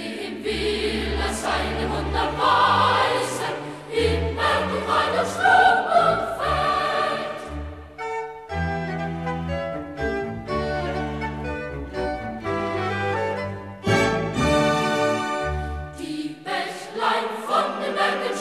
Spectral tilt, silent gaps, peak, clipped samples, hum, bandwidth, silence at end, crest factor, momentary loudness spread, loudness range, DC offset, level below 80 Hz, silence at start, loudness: -4.5 dB/octave; none; -6 dBFS; under 0.1%; none; 14 kHz; 0 s; 18 dB; 12 LU; 8 LU; under 0.1%; -38 dBFS; 0 s; -23 LUFS